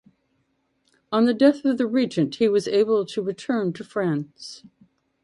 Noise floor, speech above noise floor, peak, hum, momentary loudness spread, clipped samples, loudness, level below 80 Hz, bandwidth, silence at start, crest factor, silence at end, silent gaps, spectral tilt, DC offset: -70 dBFS; 48 dB; -4 dBFS; none; 10 LU; under 0.1%; -22 LUFS; -70 dBFS; 11.5 kHz; 1.1 s; 20 dB; 0.65 s; none; -6.5 dB/octave; under 0.1%